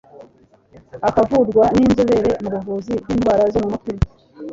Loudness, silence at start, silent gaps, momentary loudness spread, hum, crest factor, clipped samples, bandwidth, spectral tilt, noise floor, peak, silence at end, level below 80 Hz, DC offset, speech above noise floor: -18 LUFS; 0.2 s; none; 10 LU; none; 16 dB; under 0.1%; 7.8 kHz; -7.5 dB/octave; -51 dBFS; -2 dBFS; 0 s; -36 dBFS; under 0.1%; 35 dB